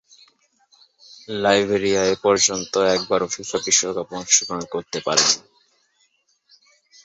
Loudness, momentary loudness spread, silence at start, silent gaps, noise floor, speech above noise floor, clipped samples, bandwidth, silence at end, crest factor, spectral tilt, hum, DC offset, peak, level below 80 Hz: -19 LUFS; 10 LU; 1.3 s; none; -65 dBFS; 44 dB; under 0.1%; 8.4 kHz; 1.65 s; 20 dB; -1.5 dB/octave; none; under 0.1%; -2 dBFS; -58 dBFS